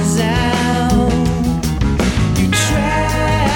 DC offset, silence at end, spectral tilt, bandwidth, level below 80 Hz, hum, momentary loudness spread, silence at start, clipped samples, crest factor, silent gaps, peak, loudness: under 0.1%; 0 s; -5 dB/octave; 17.5 kHz; -24 dBFS; none; 3 LU; 0 s; under 0.1%; 12 dB; none; -2 dBFS; -15 LUFS